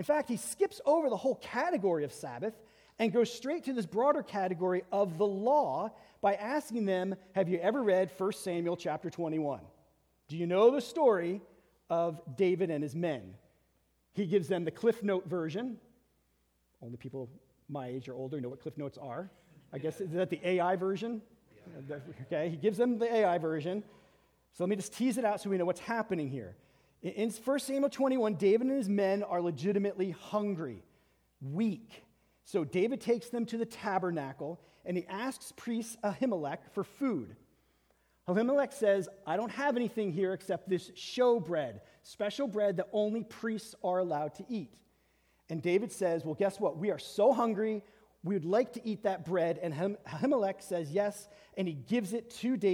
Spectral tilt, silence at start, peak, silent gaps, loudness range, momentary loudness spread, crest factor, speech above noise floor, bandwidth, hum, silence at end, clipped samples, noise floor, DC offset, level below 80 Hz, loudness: -6 dB/octave; 0 s; -14 dBFS; none; 5 LU; 13 LU; 20 dB; 42 dB; 17.5 kHz; none; 0 s; under 0.1%; -74 dBFS; under 0.1%; -76 dBFS; -33 LUFS